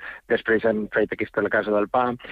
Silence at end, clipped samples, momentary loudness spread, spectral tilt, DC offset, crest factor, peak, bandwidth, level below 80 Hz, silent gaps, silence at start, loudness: 0 s; under 0.1%; 4 LU; -8 dB/octave; under 0.1%; 14 dB; -10 dBFS; 5 kHz; -56 dBFS; none; 0 s; -23 LUFS